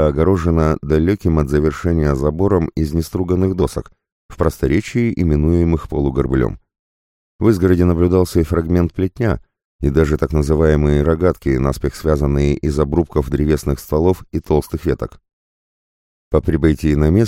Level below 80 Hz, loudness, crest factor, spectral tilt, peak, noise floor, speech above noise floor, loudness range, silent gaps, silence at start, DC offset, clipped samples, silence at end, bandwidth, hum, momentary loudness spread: -26 dBFS; -17 LUFS; 16 dB; -8 dB/octave; 0 dBFS; under -90 dBFS; over 74 dB; 3 LU; 4.12-4.29 s, 6.79-7.39 s, 9.65-9.79 s, 15.33-16.31 s; 0 s; under 0.1%; under 0.1%; 0 s; 16 kHz; none; 6 LU